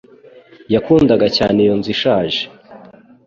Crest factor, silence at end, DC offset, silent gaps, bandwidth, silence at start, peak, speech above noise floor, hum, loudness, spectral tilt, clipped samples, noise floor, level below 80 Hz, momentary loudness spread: 14 dB; 0.5 s; under 0.1%; none; 7.4 kHz; 0.7 s; -2 dBFS; 29 dB; none; -14 LUFS; -6.5 dB/octave; under 0.1%; -43 dBFS; -44 dBFS; 8 LU